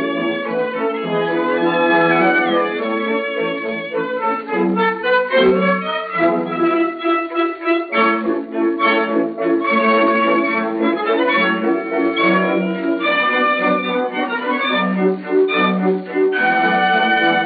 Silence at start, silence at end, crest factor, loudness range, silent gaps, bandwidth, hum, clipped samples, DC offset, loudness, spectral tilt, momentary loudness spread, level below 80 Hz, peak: 0 s; 0 s; 14 dB; 2 LU; none; 4.8 kHz; none; under 0.1%; under 0.1%; -17 LUFS; -3 dB/octave; 6 LU; -64 dBFS; -2 dBFS